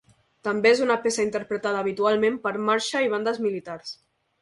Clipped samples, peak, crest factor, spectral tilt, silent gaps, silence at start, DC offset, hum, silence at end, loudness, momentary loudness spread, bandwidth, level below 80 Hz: under 0.1%; -6 dBFS; 18 dB; -3.5 dB/octave; none; 0.45 s; under 0.1%; none; 0.5 s; -24 LUFS; 14 LU; 11.5 kHz; -66 dBFS